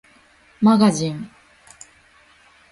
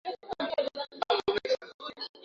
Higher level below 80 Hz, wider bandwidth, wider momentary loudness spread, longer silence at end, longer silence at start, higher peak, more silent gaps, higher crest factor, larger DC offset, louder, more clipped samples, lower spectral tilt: first, -60 dBFS vs -66 dBFS; first, 11.5 kHz vs 7.6 kHz; first, 20 LU vs 11 LU; first, 1.45 s vs 0.05 s; first, 0.6 s vs 0.05 s; first, -4 dBFS vs -14 dBFS; second, none vs 1.74-1.79 s, 2.09-2.14 s; about the same, 18 dB vs 20 dB; neither; first, -18 LUFS vs -32 LUFS; neither; first, -6 dB/octave vs -3.5 dB/octave